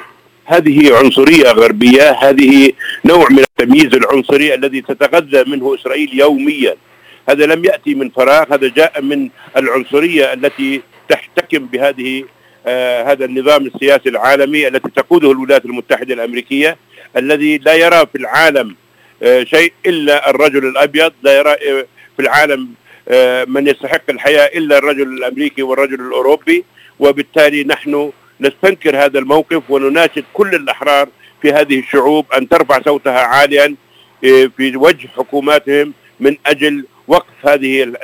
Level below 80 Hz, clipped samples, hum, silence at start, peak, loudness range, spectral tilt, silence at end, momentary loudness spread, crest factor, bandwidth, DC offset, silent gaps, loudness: -52 dBFS; 0.8%; none; 0 s; 0 dBFS; 6 LU; -4 dB/octave; 0 s; 10 LU; 10 dB; 16 kHz; under 0.1%; none; -10 LUFS